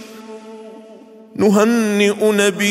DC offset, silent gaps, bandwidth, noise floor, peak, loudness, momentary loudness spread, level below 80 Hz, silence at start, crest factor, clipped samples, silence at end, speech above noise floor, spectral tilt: under 0.1%; none; 16 kHz; -41 dBFS; -2 dBFS; -15 LUFS; 21 LU; -64 dBFS; 0 s; 16 dB; under 0.1%; 0 s; 27 dB; -4.5 dB/octave